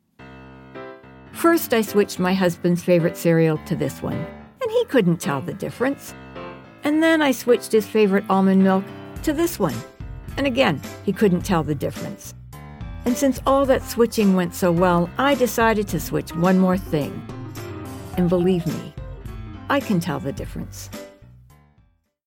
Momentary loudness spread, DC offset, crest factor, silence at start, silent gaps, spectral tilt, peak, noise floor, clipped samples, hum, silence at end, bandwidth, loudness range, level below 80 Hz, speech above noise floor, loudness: 19 LU; under 0.1%; 18 dB; 0.2 s; none; -6 dB/octave; -4 dBFS; -60 dBFS; under 0.1%; none; 1.15 s; 17 kHz; 5 LU; -44 dBFS; 40 dB; -21 LUFS